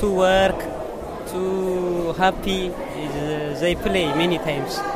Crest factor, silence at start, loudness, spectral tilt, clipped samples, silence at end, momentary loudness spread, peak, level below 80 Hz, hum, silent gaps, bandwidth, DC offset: 18 dB; 0 s; -22 LUFS; -5 dB/octave; under 0.1%; 0 s; 11 LU; -4 dBFS; -38 dBFS; none; none; 16 kHz; under 0.1%